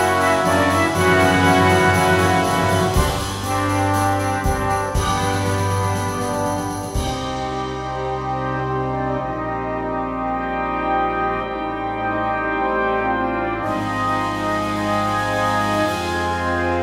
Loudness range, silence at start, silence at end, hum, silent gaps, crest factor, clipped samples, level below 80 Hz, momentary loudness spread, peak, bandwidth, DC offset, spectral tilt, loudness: 7 LU; 0 s; 0 s; none; none; 16 dB; under 0.1%; -34 dBFS; 9 LU; -2 dBFS; 16 kHz; under 0.1%; -5 dB/octave; -20 LUFS